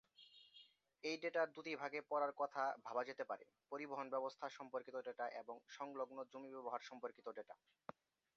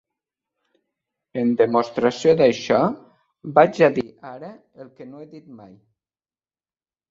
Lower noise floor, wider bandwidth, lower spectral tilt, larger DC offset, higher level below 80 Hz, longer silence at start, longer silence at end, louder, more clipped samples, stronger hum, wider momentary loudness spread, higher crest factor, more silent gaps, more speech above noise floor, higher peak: second, -69 dBFS vs under -90 dBFS; about the same, 7.2 kHz vs 7.6 kHz; second, -1.5 dB/octave vs -6 dB/octave; neither; second, under -90 dBFS vs -64 dBFS; second, 0.2 s vs 1.35 s; second, 0.8 s vs 1.55 s; second, -47 LUFS vs -19 LUFS; neither; neither; second, 17 LU vs 24 LU; about the same, 20 dB vs 20 dB; neither; second, 22 dB vs over 70 dB; second, -28 dBFS vs -2 dBFS